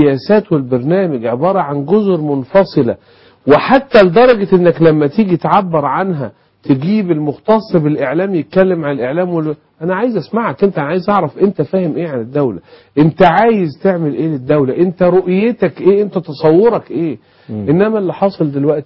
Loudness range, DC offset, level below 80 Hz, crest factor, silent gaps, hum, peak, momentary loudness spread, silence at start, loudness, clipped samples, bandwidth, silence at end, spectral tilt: 5 LU; under 0.1%; -48 dBFS; 12 dB; none; none; 0 dBFS; 10 LU; 0 s; -13 LUFS; under 0.1%; 5.8 kHz; 0 s; -10 dB/octave